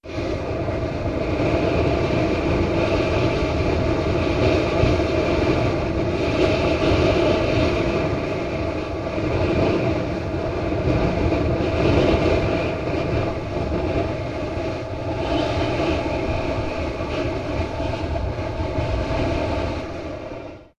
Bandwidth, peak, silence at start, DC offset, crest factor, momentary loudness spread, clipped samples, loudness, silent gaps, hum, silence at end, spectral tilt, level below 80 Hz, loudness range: 10.5 kHz; -6 dBFS; 0.05 s; under 0.1%; 16 dB; 7 LU; under 0.1%; -22 LUFS; none; none; 0.15 s; -7 dB/octave; -30 dBFS; 5 LU